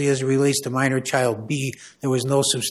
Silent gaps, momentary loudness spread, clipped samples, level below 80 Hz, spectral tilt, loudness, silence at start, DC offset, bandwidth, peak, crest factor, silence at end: none; 7 LU; under 0.1%; -64 dBFS; -4.5 dB/octave; -22 LUFS; 0 s; under 0.1%; 14.5 kHz; -6 dBFS; 16 dB; 0 s